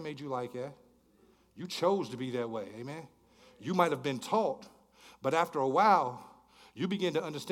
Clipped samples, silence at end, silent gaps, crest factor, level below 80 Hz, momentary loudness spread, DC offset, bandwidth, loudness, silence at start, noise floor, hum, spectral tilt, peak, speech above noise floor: under 0.1%; 0 s; none; 22 dB; -76 dBFS; 18 LU; under 0.1%; 17.5 kHz; -32 LUFS; 0 s; -65 dBFS; none; -5.5 dB/octave; -12 dBFS; 33 dB